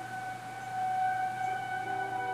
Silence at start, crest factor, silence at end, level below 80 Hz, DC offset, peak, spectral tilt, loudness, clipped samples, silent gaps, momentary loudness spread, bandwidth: 0 s; 12 dB; 0 s; -74 dBFS; under 0.1%; -22 dBFS; -4 dB/octave; -34 LUFS; under 0.1%; none; 8 LU; 15.5 kHz